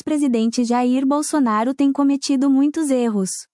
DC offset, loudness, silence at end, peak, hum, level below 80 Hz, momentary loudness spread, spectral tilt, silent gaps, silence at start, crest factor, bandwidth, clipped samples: under 0.1%; -18 LUFS; 0.1 s; -8 dBFS; none; -68 dBFS; 2 LU; -4.5 dB/octave; none; 0.05 s; 10 dB; 12 kHz; under 0.1%